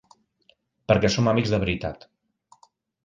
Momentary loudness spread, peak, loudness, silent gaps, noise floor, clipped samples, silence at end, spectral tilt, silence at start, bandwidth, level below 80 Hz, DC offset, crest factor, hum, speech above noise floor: 19 LU; -4 dBFS; -23 LUFS; none; -64 dBFS; under 0.1%; 1.1 s; -6 dB/octave; 0.9 s; 9.4 kHz; -46 dBFS; under 0.1%; 22 dB; none; 42 dB